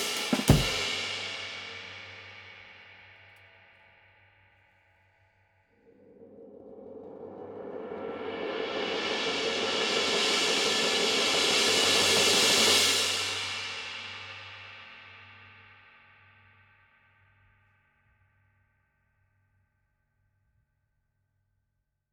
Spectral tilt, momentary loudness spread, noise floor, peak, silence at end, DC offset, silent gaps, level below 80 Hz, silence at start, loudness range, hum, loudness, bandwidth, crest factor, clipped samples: -2 dB/octave; 25 LU; -80 dBFS; -6 dBFS; 6.65 s; under 0.1%; none; -50 dBFS; 0 s; 23 LU; none; -25 LUFS; over 20 kHz; 26 dB; under 0.1%